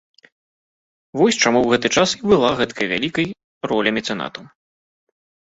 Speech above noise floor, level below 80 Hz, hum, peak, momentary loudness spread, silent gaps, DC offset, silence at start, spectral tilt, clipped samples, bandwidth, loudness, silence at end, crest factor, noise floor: over 72 dB; -54 dBFS; none; 0 dBFS; 13 LU; 3.44-3.61 s; under 0.1%; 1.15 s; -3.5 dB/octave; under 0.1%; 8 kHz; -18 LUFS; 1.15 s; 20 dB; under -90 dBFS